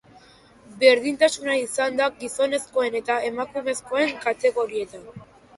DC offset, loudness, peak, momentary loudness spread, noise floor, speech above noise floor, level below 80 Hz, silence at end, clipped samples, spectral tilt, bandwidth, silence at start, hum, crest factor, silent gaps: under 0.1%; -23 LUFS; -2 dBFS; 10 LU; -52 dBFS; 29 dB; -64 dBFS; 0.35 s; under 0.1%; -2.5 dB/octave; 11.5 kHz; 0.7 s; none; 22 dB; none